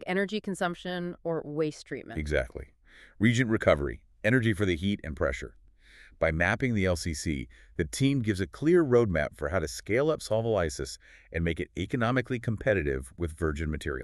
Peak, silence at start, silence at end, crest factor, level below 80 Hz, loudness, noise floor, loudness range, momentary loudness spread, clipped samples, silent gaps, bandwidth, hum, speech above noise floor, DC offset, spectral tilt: -8 dBFS; 0 s; 0 s; 20 dB; -44 dBFS; -29 LUFS; -55 dBFS; 4 LU; 12 LU; under 0.1%; none; 13 kHz; none; 27 dB; under 0.1%; -6 dB/octave